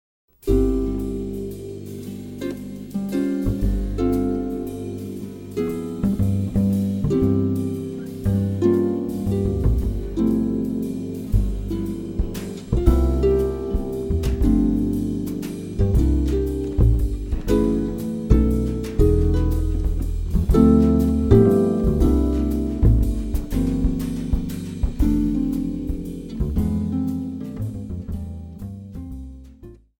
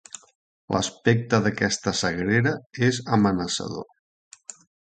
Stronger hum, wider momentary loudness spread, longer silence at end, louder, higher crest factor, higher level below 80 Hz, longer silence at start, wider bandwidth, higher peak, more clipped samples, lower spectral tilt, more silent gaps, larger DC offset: neither; second, 12 LU vs 20 LU; about the same, 0.25 s vs 0.35 s; about the same, -22 LUFS vs -24 LUFS; about the same, 20 dB vs 20 dB; first, -26 dBFS vs -52 dBFS; second, 0.45 s vs 0.7 s; first, 16.5 kHz vs 9.4 kHz; first, 0 dBFS vs -4 dBFS; neither; first, -9 dB/octave vs -5 dB/octave; second, none vs 2.66-2.70 s, 3.99-4.31 s; neither